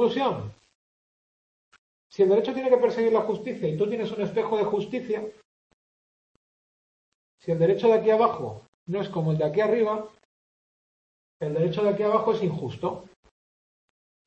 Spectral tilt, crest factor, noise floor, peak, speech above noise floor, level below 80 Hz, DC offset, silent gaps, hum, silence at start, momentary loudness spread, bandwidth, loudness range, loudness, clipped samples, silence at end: -8 dB/octave; 20 dB; under -90 dBFS; -6 dBFS; over 66 dB; -66 dBFS; under 0.1%; 0.75-1.72 s, 1.79-2.10 s, 5.45-7.38 s, 8.68-8.86 s, 10.25-11.40 s; none; 0 s; 14 LU; 7.8 kHz; 5 LU; -25 LUFS; under 0.1%; 1.2 s